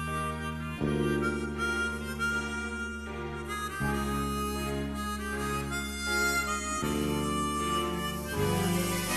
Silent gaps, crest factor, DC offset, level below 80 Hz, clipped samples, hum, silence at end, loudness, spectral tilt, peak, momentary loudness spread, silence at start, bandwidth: none; 16 dB; under 0.1%; -42 dBFS; under 0.1%; none; 0 s; -31 LUFS; -4.5 dB/octave; -16 dBFS; 7 LU; 0 s; 13 kHz